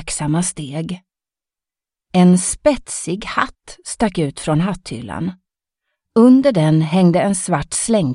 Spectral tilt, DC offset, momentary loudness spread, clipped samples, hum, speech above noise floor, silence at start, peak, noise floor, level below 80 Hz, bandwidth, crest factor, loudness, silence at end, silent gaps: -5.5 dB/octave; under 0.1%; 14 LU; under 0.1%; none; 72 dB; 0 s; 0 dBFS; -88 dBFS; -44 dBFS; 11.5 kHz; 16 dB; -17 LUFS; 0 s; none